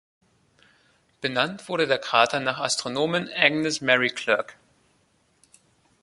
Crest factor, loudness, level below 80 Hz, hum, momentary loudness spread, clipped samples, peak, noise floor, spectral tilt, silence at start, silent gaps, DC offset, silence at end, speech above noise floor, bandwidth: 26 dB; -23 LUFS; -70 dBFS; none; 6 LU; under 0.1%; -2 dBFS; -66 dBFS; -3 dB/octave; 1.25 s; none; under 0.1%; 1.5 s; 42 dB; 11.5 kHz